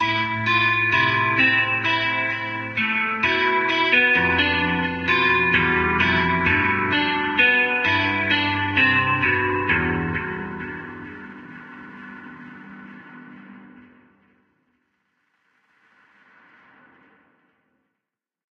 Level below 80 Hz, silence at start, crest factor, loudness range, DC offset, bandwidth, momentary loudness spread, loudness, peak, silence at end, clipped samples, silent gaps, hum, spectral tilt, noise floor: -48 dBFS; 0 s; 18 dB; 15 LU; under 0.1%; 7.4 kHz; 22 LU; -19 LUFS; -4 dBFS; 4.7 s; under 0.1%; none; none; -5.5 dB/octave; -85 dBFS